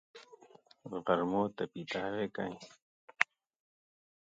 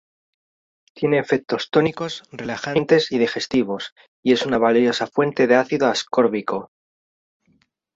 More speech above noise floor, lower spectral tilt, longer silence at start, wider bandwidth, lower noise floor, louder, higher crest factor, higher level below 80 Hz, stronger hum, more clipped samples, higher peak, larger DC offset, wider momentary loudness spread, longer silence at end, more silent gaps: second, 26 dB vs 44 dB; about the same, -5.5 dB/octave vs -5 dB/octave; second, 0.15 s vs 0.95 s; first, 9 kHz vs 8 kHz; about the same, -62 dBFS vs -64 dBFS; second, -36 LUFS vs -20 LUFS; first, 34 dB vs 18 dB; second, -74 dBFS vs -60 dBFS; neither; neither; about the same, -4 dBFS vs -2 dBFS; neither; first, 23 LU vs 12 LU; second, 1 s vs 1.3 s; first, 2.82-3.08 s vs 3.92-3.96 s, 4.08-4.23 s